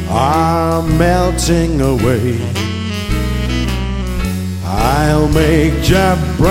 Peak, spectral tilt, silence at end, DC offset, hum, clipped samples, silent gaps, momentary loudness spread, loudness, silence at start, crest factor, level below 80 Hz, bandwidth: 0 dBFS; -6 dB/octave; 0 s; under 0.1%; none; under 0.1%; none; 7 LU; -14 LUFS; 0 s; 12 dB; -20 dBFS; 16.5 kHz